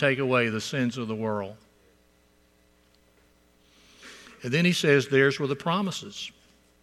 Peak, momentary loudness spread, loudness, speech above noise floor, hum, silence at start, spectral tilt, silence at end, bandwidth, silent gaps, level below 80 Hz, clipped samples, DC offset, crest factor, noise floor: -6 dBFS; 18 LU; -25 LUFS; 37 dB; none; 0 s; -5 dB/octave; 0.55 s; 14.5 kHz; none; -66 dBFS; under 0.1%; under 0.1%; 22 dB; -63 dBFS